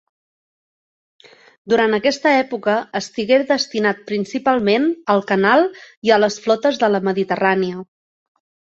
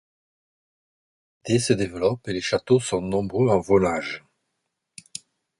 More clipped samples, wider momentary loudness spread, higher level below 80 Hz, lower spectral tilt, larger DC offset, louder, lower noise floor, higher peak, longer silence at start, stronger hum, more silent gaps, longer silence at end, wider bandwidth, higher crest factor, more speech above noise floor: neither; second, 8 LU vs 18 LU; second, -62 dBFS vs -52 dBFS; about the same, -5 dB/octave vs -5.5 dB/octave; neither; first, -18 LUFS vs -23 LUFS; first, under -90 dBFS vs -79 dBFS; about the same, -2 dBFS vs -4 dBFS; first, 1.65 s vs 1.45 s; neither; first, 5.97-6.02 s vs none; second, 0.9 s vs 1.4 s; second, 7.8 kHz vs 11.5 kHz; about the same, 18 dB vs 20 dB; first, over 73 dB vs 57 dB